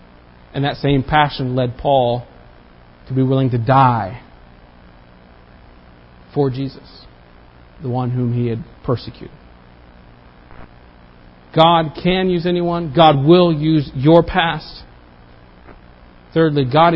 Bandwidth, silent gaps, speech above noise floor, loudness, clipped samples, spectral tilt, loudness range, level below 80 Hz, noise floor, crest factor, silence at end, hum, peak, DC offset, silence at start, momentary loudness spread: 5.8 kHz; none; 29 dB; -16 LUFS; under 0.1%; -9.5 dB/octave; 12 LU; -42 dBFS; -44 dBFS; 18 dB; 0 s; 60 Hz at -40 dBFS; 0 dBFS; under 0.1%; 0.55 s; 14 LU